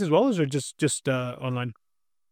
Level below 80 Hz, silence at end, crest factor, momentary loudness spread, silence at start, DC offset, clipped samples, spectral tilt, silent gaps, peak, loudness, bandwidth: -68 dBFS; 0.6 s; 18 dB; 9 LU; 0 s; under 0.1%; under 0.1%; -5.5 dB/octave; none; -8 dBFS; -26 LUFS; 15.5 kHz